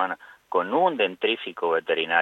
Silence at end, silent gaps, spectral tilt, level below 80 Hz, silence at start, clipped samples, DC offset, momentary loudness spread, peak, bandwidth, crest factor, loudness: 0 s; none; -5.5 dB/octave; -76 dBFS; 0 s; under 0.1%; under 0.1%; 6 LU; -6 dBFS; 6.4 kHz; 18 dB; -24 LUFS